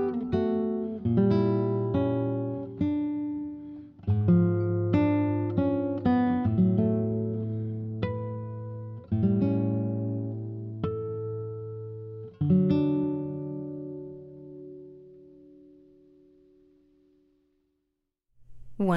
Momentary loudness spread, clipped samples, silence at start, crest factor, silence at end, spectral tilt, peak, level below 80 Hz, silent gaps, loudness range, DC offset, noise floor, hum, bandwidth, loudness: 16 LU; under 0.1%; 0 s; 16 dB; 0 s; -11 dB/octave; -12 dBFS; -56 dBFS; none; 7 LU; under 0.1%; -81 dBFS; none; 5.6 kHz; -28 LUFS